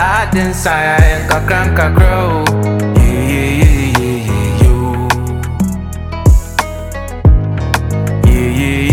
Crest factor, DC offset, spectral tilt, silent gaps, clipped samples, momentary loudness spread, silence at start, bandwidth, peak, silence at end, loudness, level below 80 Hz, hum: 10 dB; under 0.1%; -6 dB/octave; none; 0.3%; 7 LU; 0 s; 17 kHz; 0 dBFS; 0 s; -12 LUFS; -16 dBFS; none